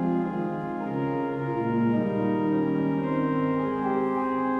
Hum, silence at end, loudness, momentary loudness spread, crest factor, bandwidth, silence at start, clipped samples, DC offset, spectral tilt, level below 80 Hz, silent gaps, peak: none; 0 s; -27 LUFS; 4 LU; 12 dB; 4.9 kHz; 0 s; under 0.1%; under 0.1%; -10 dB/octave; -58 dBFS; none; -14 dBFS